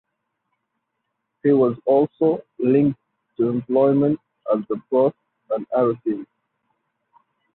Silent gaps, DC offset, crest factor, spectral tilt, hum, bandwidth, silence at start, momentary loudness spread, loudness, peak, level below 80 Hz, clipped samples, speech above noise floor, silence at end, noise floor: none; under 0.1%; 16 dB; -13 dB/octave; none; 4.2 kHz; 1.45 s; 10 LU; -21 LUFS; -6 dBFS; -66 dBFS; under 0.1%; 58 dB; 1.3 s; -77 dBFS